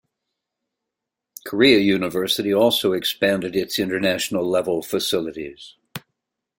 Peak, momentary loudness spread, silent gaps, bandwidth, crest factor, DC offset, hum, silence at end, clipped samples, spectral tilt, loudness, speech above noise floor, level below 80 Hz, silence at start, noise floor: -2 dBFS; 20 LU; none; 17 kHz; 20 dB; under 0.1%; none; 0.6 s; under 0.1%; -4 dB/octave; -20 LUFS; 64 dB; -60 dBFS; 1.45 s; -84 dBFS